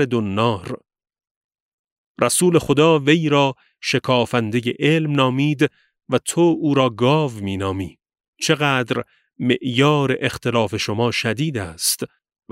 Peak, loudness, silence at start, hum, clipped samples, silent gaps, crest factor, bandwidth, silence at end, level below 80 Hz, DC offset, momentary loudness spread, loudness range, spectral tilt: -2 dBFS; -19 LUFS; 0 s; none; under 0.1%; 1.31-1.49 s, 1.60-1.84 s, 1.92-2.15 s, 8.28-8.33 s; 18 dB; 16 kHz; 0.45 s; -56 dBFS; under 0.1%; 10 LU; 3 LU; -5 dB/octave